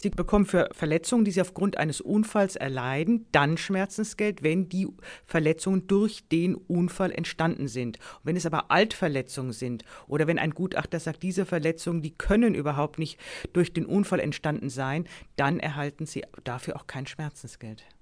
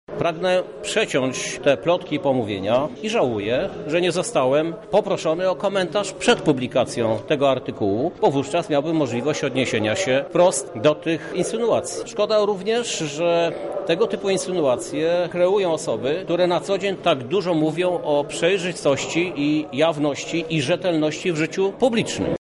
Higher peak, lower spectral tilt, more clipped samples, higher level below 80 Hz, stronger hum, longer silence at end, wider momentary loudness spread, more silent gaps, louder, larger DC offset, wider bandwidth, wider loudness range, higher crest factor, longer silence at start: about the same, -6 dBFS vs -6 dBFS; first, -6 dB/octave vs -4.5 dB/octave; neither; first, -48 dBFS vs -56 dBFS; neither; first, 0.2 s vs 0.05 s; first, 12 LU vs 4 LU; neither; second, -27 LUFS vs -21 LUFS; neither; about the same, 11 kHz vs 11.5 kHz; first, 4 LU vs 1 LU; about the same, 20 dB vs 16 dB; about the same, 0 s vs 0.1 s